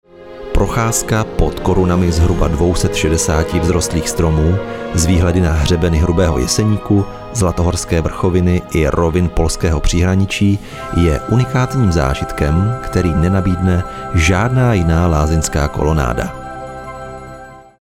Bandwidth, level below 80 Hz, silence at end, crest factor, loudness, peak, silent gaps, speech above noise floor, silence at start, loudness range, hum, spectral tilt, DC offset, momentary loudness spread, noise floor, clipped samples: 15.5 kHz; -22 dBFS; 0.2 s; 14 dB; -15 LUFS; 0 dBFS; none; 21 dB; 0.2 s; 1 LU; none; -5.5 dB/octave; under 0.1%; 7 LU; -35 dBFS; under 0.1%